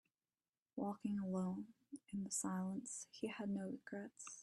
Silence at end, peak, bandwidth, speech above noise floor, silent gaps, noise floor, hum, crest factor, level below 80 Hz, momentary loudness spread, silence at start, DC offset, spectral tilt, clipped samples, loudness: 0 s; -30 dBFS; 12.5 kHz; over 45 dB; none; under -90 dBFS; none; 16 dB; -82 dBFS; 10 LU; 0.75 s; under 0.1%; -5 dB/octave; under 0.1%; -46 LUFS